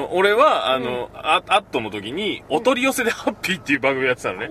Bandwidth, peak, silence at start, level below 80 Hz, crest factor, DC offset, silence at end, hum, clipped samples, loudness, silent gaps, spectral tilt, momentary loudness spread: 15.5 kHz; -2 dBFS; 0 s; -54 dBFS; 18 dB; under 0.1%; 0 s; none; under 0.1%; -20 LUFS; none; -3.5 dB/octave; 10 LU